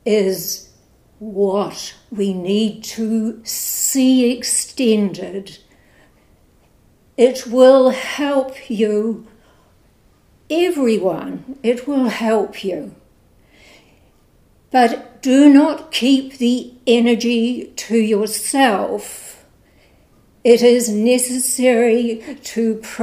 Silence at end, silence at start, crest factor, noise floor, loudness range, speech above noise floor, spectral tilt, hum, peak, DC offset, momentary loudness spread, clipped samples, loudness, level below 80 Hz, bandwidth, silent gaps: 0 s; 0.05 s; 18 dB; -54 dBFS; 6 LU; 38 dB; -4 dB/octave; none; 0 dBFS; under 0.1%; 15 LU; under 0.1%; -16 LUFS; -58 dBFS; 16 kHz; none